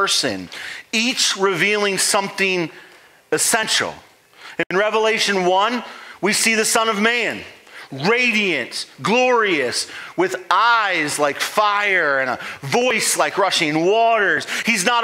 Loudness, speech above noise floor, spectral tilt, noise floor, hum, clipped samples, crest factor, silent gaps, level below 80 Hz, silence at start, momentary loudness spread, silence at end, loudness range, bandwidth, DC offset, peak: -18 LUFS; 24 dB; -2 dB/octave; -42 dBFS; none; under 0.1%; 18 dB; 4.66-4.70 s; -68 dBFS; 0 s; 11 LU; 0 s; 2 LU; 16.5 kHz; under 0.1%; 0 dBFS